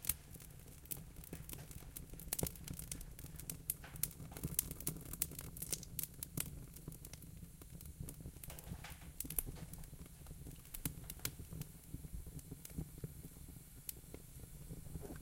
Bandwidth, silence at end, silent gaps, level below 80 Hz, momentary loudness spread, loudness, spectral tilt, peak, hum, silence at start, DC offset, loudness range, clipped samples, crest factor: 17 kHz; 0 s; none; -56 dBFS; 14 LU; -47 LUFS; -3.5 dB/octave; -12 dBFS; none; 0 s; under 0.1%; 7 LU; under 0.1%; 36 dB